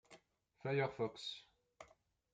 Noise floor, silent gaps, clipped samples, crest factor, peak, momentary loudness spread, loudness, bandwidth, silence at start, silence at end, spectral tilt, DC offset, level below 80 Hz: -72 dBFS; none; under 0.1%; 20 dB; -26 dBFS; 23 LU; -42 LUFS; 9 kHz; 0.1 s; 0.5 s; -5.5 dB/octave; under 0.1%; -80 dBFS